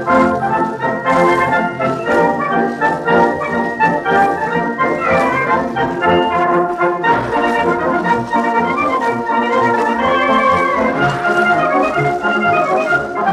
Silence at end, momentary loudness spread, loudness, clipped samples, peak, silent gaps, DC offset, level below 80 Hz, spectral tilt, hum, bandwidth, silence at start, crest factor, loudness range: 0 s; 4 LU; -14 LUFS; under 0.1%; -2 dBFS; none; under 0.1%; -46 dBFS; -6 dB/octave; none; 13 kHz; 0 s; 12 dB; 1 LU